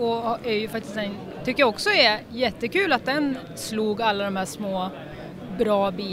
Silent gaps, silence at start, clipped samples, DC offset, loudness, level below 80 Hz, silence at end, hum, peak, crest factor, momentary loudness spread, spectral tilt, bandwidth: none; 0 s; under 0.1%; under 0.1%; -24 LUFS; -54 dBFS; 0 s; none; -6 dBFS; 18 dB; 13 LU; -4 dB/octave; 16 kHz